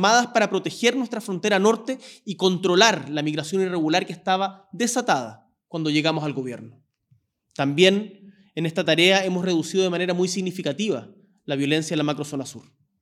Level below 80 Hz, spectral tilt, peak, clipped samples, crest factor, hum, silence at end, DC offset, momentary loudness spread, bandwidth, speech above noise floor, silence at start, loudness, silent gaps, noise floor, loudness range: -80 dBFS; -4 dB/octave; 0 dBFS; under 0.1%; 22 dB; none; 0.4 s; under 0.1%; 15 LU; 14.5 kHz; 42 dB; 0 s; -22 LUFS; none; -64 dBFS; 4 LU